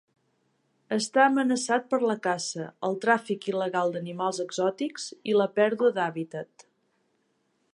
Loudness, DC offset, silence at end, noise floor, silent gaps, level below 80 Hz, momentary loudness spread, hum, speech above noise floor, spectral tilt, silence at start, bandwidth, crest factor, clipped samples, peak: -27 LUFS; under 0.1%; 1.3 s; -72 dBFS; none; -82 dBFS; 11 LU; none; 46 dB; -4 dB/octave; 0.9 s; 11 kHz; 20 dB; under 0.1%; -8 dBFS